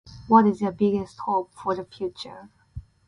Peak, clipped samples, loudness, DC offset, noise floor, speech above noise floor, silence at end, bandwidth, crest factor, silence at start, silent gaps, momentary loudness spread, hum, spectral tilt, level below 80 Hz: -4 dBFS; under 0.1%; -24 LUFS; under 0.1%; -43 dBFS; 19 dB; 0.25 s; 10.5 kHz; 20 dB; 0.1 s; none; 23 LU; none; -7.5 dB/octave; -52 dBFS